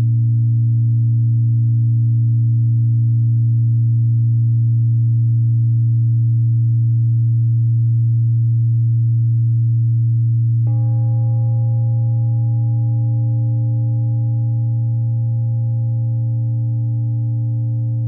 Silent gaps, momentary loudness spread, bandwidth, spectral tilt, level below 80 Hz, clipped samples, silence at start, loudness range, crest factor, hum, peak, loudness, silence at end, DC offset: none; 4 LU; 0.9 kHz; -19 dB/octave; -60 dBFS; under 0.1%; 0 s; 3 LU; 4 dB; none; -10 dBFS; -17 LUFS; 0 s; under 0.1%